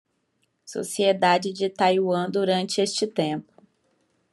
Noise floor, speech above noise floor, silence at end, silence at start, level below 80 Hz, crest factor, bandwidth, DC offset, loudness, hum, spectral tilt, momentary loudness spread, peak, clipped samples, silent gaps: -72 dBFS; 49 dB; 0.9 s; 0.65 s; -76 dBFS; 18 dB; 12.5 kHz; under 0.1%; -23 LUFS; none; -4.5 dB/octave; 10 LU; -6 dBFS; under 0.1%; none